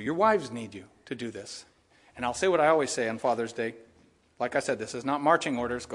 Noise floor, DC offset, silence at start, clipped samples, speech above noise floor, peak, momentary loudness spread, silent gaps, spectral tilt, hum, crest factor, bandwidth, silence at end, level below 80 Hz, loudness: -62 dBFS; under 0.1%; 0 s; under 0.1%; 34 dB; -8 dBFS; 17 LU; none; -4 dB/octave; none; 22 dB; 11.5 kHz; 0 s; -66 dBFS; -28 LUFS